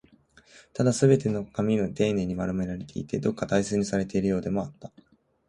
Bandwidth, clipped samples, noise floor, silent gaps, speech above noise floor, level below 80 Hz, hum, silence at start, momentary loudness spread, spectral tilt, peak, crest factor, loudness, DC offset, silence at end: 11.5 kHz; under 0.1%; -58 dBFS; none; 32 dB; -52 dBFS; none; 0.75 s; 11 LU; -6.5 dB/octave; -6 dBFS; 20 dB; -27 LUFS; under 0.1%; 0.6 s